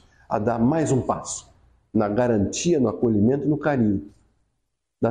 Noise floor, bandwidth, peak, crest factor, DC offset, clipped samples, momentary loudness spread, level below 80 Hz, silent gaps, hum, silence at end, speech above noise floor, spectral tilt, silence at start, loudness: -77 dBFS; 10 kHz; -8 dBFS; 16 dB; under 0.1%; under 0.1%; 8 LU; -50 dBFS; none; none; 0 s; 56 dB; -6.5 dB/octave; 0.3 s; -23 LUFS